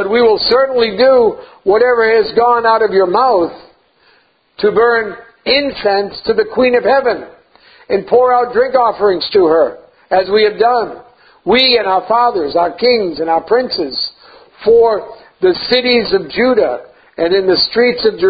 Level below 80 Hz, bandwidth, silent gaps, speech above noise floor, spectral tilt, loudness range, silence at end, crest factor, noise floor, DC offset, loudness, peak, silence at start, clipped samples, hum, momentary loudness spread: -48 dBFS; 5 kHz; none; 41 dB; -7 dB/octave; 3 LU; 0 s; 12 dB; -53 dBFS; under 0.1%; -12 LUFS; 0 dBFS; 0 s; under 0.1%; none; 8 LU